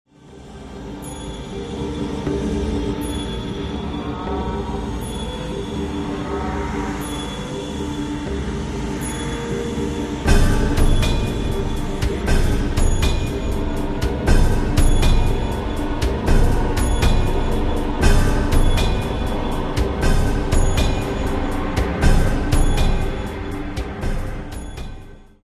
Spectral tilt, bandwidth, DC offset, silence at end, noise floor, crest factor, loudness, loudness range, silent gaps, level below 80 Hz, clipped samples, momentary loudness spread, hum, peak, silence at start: -6 dB/octave; 13 kHz; under 0.1%; 0.2 s; -40 dBFS; 18 dB; -22 LUFS; 5 LU; none; -22 dBFS; under 0.1%; 9 LU; none; -2 dBFS; 0.25 s